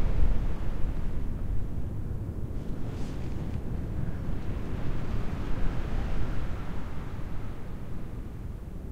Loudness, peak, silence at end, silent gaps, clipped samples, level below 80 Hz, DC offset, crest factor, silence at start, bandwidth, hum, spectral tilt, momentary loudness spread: -36 LUFS; -12 dBFS; 0 s; none; under 0.1%; -32 dBFS; under 0.1%; 16 dB; 0 s; 6.8 kHz; none; -8 dB/octave; 6 LU